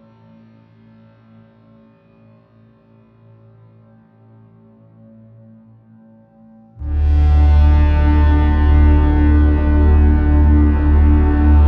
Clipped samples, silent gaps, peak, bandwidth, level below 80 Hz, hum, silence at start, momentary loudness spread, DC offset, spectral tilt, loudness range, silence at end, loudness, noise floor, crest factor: under 0.1%; none; -2 dBFS; 3.6 kHz; -16 dBFS; none; 6.8 s; 2 LU; under 0.1%; -10.5 dB/octave; 8 LU; 0 s; -14 LUFS; -49 dBFS; 12 dB